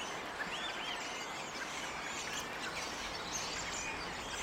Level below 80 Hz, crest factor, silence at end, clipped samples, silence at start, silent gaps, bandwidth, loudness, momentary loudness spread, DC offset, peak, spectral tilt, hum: -62 dBFS; 16 dB; 0 s; under 0.1%; 0 s; none; 16 kHz; -39 LUFS; 3 LU; under 0.1%; -26 dBFS; -1.5 dB/octave; none